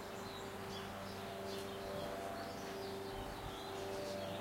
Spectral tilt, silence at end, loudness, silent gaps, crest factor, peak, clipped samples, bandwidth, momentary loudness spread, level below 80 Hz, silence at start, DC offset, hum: -4.5 dB/octave; 0 s; -45 LUFS; none; 14 dB; -32 dBFS; under 0.1%; 16 kHz; 3 LU; -62 dBFS; 0 s; under 0.1%; none